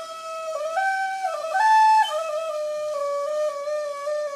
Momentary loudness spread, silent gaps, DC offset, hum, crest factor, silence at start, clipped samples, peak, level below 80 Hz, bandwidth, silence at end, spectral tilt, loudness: 12 LU; none; under 0.1%; none; 14 dB; 0 s; under 0.1%; -10 dBFS; -88 dBFS; 14 kHz; 0 s; 1 dB/octave; -23 LUFS